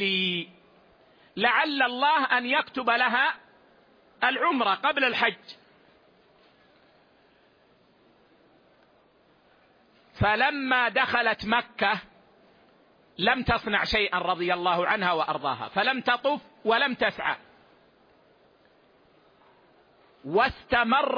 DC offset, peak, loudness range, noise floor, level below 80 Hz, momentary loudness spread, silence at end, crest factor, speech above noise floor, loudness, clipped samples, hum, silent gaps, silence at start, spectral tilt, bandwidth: under 0.1%; -8 dBFS; 7 LU; -62 dBFS; -54 dBFS; 7 LU; 0 s; 20 dB; 36 dB; -25 LUFS; under 0.1%; none; none; 0 s; -5.5 dB/octave; 5.2 kHz